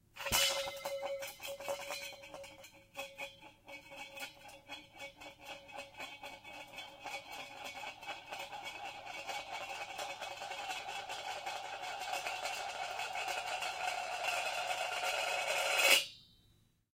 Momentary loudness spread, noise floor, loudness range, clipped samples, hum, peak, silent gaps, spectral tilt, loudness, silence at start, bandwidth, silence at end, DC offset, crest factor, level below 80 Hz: 17 LU; -70 dBFS; 15 LU; under 0.1%; none; -12 dBFS; none; 0 dB/octave; -38 LUFS; 0.15 s; 16 kHz; 0.6 s; under 0.1%; 28 dB; -68 dBFS